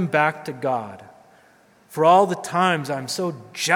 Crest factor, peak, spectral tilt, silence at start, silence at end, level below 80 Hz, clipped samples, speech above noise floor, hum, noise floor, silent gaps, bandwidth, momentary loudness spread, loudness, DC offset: 20 dB; -2 dBFS; -4.5 dB/octave; 0 s; 0 s; -74 dBFS; under 0.1%; 34 dB; none; -55 dBFS; none; 18 kHz; 13 LU; -21 LUFS; under 0.1%